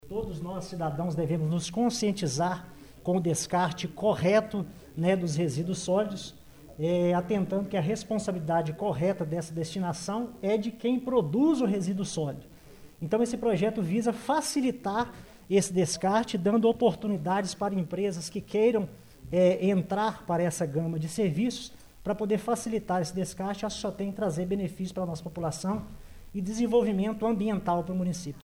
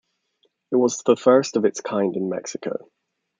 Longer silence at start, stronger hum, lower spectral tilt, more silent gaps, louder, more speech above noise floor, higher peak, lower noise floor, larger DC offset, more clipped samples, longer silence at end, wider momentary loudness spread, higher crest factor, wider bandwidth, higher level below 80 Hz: second, 0.05 s vs 0.7 s; neither; about the same, -6 dB/octave vs -5 dB/octave; neither; second, -29 LUFS vs -21 LUFS; second, 21 dB vs 48 dB; second, -12 dBFS vs -2 dBFS; second, -50 dBFS vs -68 dBFS; neither; neither; second, 0 s vs 0.6 s; second, 9 LU vs 13 LU; about the same, 16 dB vs 20 dB; first, 16.5 kHz vs 9.4 kHz; first, -56 dBFS vs -72 dBFS